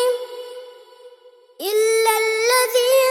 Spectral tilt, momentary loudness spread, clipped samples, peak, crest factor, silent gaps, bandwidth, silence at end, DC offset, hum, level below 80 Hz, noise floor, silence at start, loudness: 2 dB/octave; 18 LU; under 0.1%; -4 dBFS; 16 dB; none; 19 kHz; 0 s; under 0.1%; none; -80 dBFS; -49 dBFS; 0 s; -18 LUFS